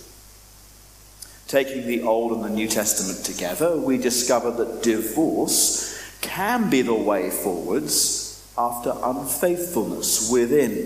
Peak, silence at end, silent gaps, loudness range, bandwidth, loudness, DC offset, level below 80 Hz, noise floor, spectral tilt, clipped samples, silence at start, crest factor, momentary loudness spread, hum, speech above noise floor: -6 dBFS; 0 s; none; 3 LU; 15.5 kHz; -22 LUFS; under 0.1%; -52 dBFS; -48 dBFS; -3 dB/octave; under 0.1%; 0 s; 18 dB; 7 LU; none; 25 dB